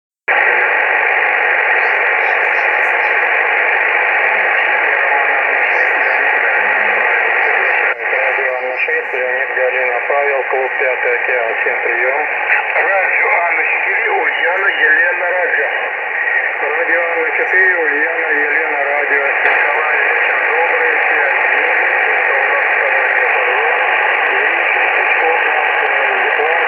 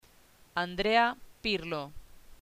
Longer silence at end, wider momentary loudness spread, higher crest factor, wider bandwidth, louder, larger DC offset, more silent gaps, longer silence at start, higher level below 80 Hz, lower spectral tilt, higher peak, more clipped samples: about the same, 0 s vs 0.05 s; second, 3 LU vs 12 LU; second, 14 dB vs 20 dB; second, 6.2 kHz vs 15.5 kHz; first, -12 LUFS vs -31 LUFS; neither; neither; second, 0.3 s vs 0.55 s; second, -68 dBFS vs -54 dBFS; second, -3 dB/octave vs -5 dB/octave; first, 0 dBFS vs -12 dBFS; neither